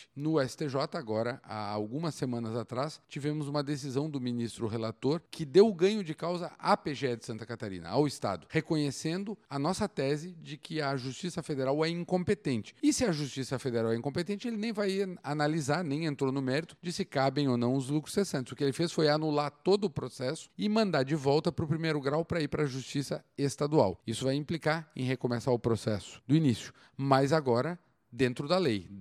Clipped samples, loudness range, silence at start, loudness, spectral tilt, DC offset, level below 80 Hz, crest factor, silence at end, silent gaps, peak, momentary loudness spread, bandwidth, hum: under 0.1%; 4 LU; 0 s; -32 LUFS; -6 dB/octave; under 0.1%; -64 dBFS; 22 dB; 0 s; none; -8 dBFS; 9 LU; 13.5 kHz; none